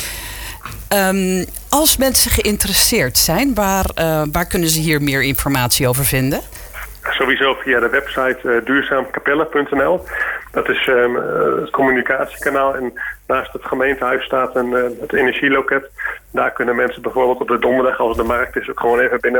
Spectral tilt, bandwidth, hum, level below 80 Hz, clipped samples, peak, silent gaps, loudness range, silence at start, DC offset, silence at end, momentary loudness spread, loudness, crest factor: -3.5 dB/octave; 19.5 kHz; none; -34 dBFS; under 0.1%; 0 dBFS; none; 4 LU; 0 s; under 0.1%; 0 s; 9 LU; -16 LUFS; 16 dB